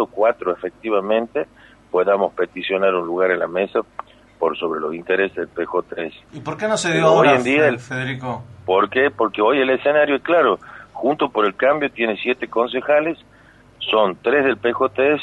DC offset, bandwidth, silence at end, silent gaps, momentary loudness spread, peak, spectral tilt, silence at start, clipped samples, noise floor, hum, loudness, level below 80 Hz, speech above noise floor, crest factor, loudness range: under 0.1%; 10.5 kHz; 0 s; none; 11 LU; -2 dBFS; -5 dB/octave; 0 s; under 0.1%; -49 dBFS; none; -19 LUFS; -58 dBFS; 30 dB; 18 dB; 4 LU